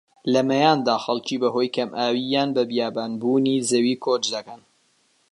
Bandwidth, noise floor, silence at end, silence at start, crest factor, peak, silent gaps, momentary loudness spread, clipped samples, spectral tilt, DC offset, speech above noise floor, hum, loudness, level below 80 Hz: 11.5 kHz; -64 dBFS; 0.75 s; 0.25 s; 20 dB; -2 dBFS; none; 7 LU; under 0.1%; -4.5 dB/octave; under 0.1%; 42 dB; none; -22 LUFS; -72 dBFS